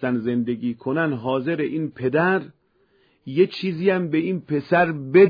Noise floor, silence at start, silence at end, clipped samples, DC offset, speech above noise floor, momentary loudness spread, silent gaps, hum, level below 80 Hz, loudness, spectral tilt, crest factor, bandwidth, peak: -62 dBFS; 0 s; 0 s; under 0.1%; under 0.1%; 42 dB; 6 LU; none; none; -64 dBFS; -22 LUFS; -9.5 dB/octave; 18 dB; 5.2 kHz; -4 dBFS